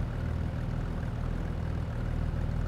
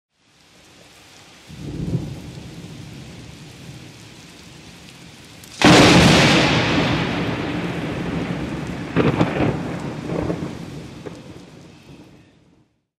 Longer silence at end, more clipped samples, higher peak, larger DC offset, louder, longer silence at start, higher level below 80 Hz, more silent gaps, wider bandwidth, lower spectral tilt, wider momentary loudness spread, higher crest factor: second, 0 s vs 0.95 s; neither; second, -20 dBFS vs 0 dBFS; neither; second, -34 LUFS vs -18 LUFS; second, 0 s vs 1.5 s; about the same, -36 dBFS vs -40 dBFS; neither; second, 10 kHz vs 15 kHz; first, -8.5 dB/octave vs -5 dB/octave; second, 2 LU vs 29 LU; second, 10 dB vs 22 dB